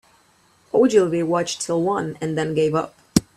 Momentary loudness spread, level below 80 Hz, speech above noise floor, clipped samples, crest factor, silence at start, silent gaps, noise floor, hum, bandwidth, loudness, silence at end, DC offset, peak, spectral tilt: 8 LU; -52 dBFS; 38 dB; under 0.1%; 22 dB; 0.75 s; none; -58 dBFS; none; 14.5 kHz; -21 LUFS; 0.15 s; under 0.1%; 0 dBFS; -5 dB/octave